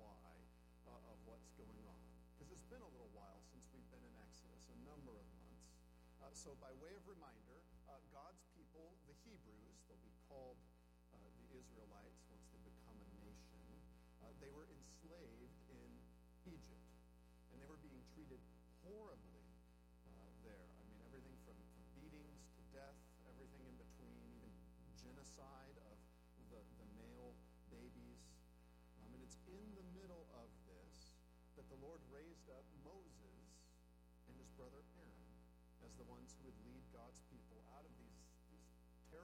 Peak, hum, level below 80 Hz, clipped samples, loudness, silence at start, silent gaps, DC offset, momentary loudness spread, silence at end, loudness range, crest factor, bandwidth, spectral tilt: -46 dBFS; 60 Hz at -65 dBFS; -68 dBFS; under 0.1%; -64 LUFS; 0 s; none; under 0.1%; 7 LU; 0 s; 3 LU; 18 dB; 15.5 kHz; -5.5 dB/octave